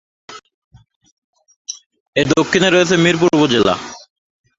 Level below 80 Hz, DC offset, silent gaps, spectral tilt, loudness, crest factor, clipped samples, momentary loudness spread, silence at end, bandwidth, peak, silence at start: -50 dBFS; under 0.1%; 0.54-0.71 s, 0.96-1.01 s, 1.11-1.33 s, 1.56-1.65 s, 1.86-1.90 s, 2.00-2.13 s; -4.5 dB/octave; -14 LUFS; 16 dB; under 0.1%; 19 LU; 0.6 s; 8 kHz; 0 dBFS; 0.3 s